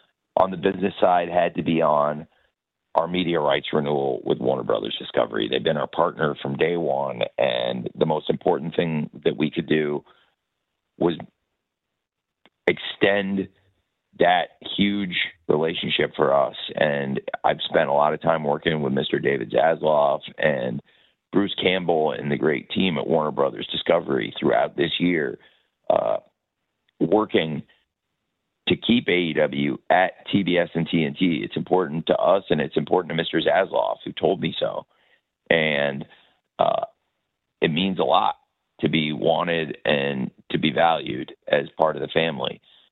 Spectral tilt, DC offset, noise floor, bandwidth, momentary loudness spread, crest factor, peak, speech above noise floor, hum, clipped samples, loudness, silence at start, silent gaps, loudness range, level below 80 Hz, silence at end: -8.5 dB/octave; under 0.1%; -82 dBFS; 4.4 kHz; 7 LU; 22 dB; -2 dBFS; 60 dB; none; under 0.1%; -23 LUFS; 0.35 s; none; 4 LU; -60 dBFS; 0.35 s